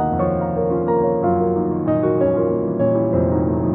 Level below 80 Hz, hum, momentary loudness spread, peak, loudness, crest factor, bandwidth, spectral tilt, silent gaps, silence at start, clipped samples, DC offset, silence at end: -42 dBFS; none; 3 LU; -6 dBFS; -19 LUFS; 12 dB; 3.3 kHz; -11 dB/octave; none; 0 s; under 0.1%; under 0.1%; 0 s